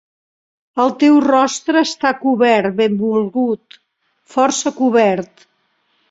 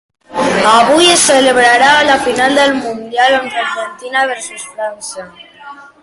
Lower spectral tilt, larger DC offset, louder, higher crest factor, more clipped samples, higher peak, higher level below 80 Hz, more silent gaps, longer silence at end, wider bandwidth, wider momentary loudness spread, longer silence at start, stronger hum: first, -4.5 dB/octave vs -1.5 dB/octave; neither; second, -15 LUFS vs -10 LUFS; about the same, 14 dB vs 12 dB; neither; about the same, -2 dBFS vs 0 dBFS; second, -62 dBFS vs -50 dBFS; neither; first, 0.85 s vs 0.2 s; second, 8 kHz vs 12 kHz; second, 11 LU vs 15 LU; first, 0.75 s vs 0.3 s; neither